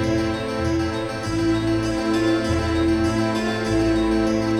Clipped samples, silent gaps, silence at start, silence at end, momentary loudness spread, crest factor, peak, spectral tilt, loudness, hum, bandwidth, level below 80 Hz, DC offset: under 0.1%; none; 0 s; 0 s; 4 LU; 12 dB; -8 dBFS; -6 dB/octave; -22 LUFS; none; 11.5 kHz; -36 dBFS; under 0.1%